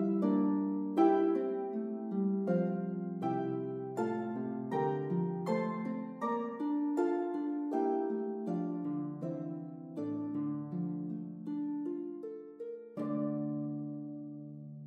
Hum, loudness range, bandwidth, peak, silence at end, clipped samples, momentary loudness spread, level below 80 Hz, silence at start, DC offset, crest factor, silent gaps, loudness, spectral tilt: none; 6 LU; 7.6 kHz; -16 dBFS; 0 s; under 0.1%; 12 LU; -88 dBFS; 0 s; under 0.1%; 18 dB; none; -35 LUFS; -9.5 dB/octave